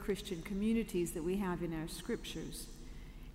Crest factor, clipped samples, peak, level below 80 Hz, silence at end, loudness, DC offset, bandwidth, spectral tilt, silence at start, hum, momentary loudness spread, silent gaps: 14 dB; under 0.1%; -24 dBFS; -50 dBFS; 0 s; -39 LUFS; under 0.1%; 16 kHz; -5.5 dB/octave; 0 s; none; 16 LU; none